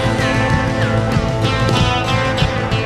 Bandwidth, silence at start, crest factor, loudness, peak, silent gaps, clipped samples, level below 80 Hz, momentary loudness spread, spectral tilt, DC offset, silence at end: 12.5 kHz; 0 s; 12 dB; -16 LUFS; -2 dBFS; none; under 0.1%; -28 dBFS; 2 LU; -5.5 dB/octave; under 0.1%; 0 s